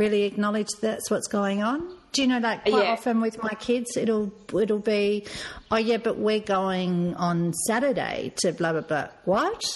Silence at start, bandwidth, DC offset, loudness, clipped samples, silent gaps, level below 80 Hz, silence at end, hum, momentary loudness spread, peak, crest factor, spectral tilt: 0 s; 12 kHz; under 0.1%; -25 LUFS; under 0.1%; none; -58 dBFS; 0 s; none; 5 LU; -10 dBFS; 16 dB; -4.5 dB/octave